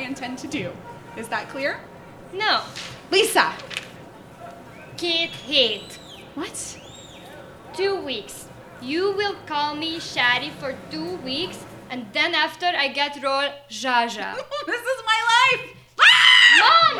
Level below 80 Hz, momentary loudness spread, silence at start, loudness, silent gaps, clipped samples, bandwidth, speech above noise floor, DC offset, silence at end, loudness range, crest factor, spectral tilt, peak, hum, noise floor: -60 dBFS; 23 LU; 0 s; -19 LUFS; none; under 0.1%; over 20 kHz; 20 dB; under 0.1%; 0 s; 9 LU; 22 dB; -1.5 dB/octave; 0 dBFS; none; -43 dBFS